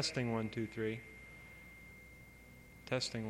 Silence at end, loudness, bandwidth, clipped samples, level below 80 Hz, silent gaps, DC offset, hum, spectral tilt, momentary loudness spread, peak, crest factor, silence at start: 0 s; -40 LUFS; 16.5 kHz; under 0.1%; -64 dBFS; none; under 0.1%; none; -4.5 dB/octave; 19 LU; -22 dBFS; 20 dB; 0 s